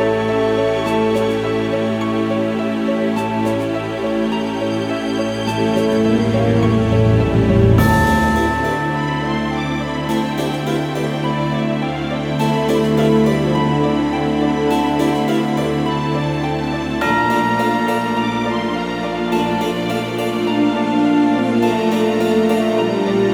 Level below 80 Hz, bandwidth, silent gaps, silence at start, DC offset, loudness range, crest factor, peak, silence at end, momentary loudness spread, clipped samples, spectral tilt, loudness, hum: -36 dBFS; 18.5 kHz; none; 0 s; under 0.1%; 4 LU; 16 dB; -2 dBFS; 0 s; 6 LU; under 0.1%; -6.5 dB/octave; -17 LUFS; none